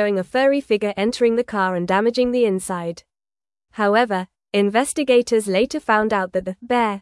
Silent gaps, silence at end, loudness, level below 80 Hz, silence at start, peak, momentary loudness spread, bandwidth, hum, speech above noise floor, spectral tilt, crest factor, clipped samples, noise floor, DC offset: none; 0 s; -20 LUFS; -56 dBFS; 0 s; -4 dBFS; 9 LU; 12 kHz; none; over 71 dB; -4.5 dB/octave; 16 dB; under 0.1%; under -90 dBFS; under 0.1%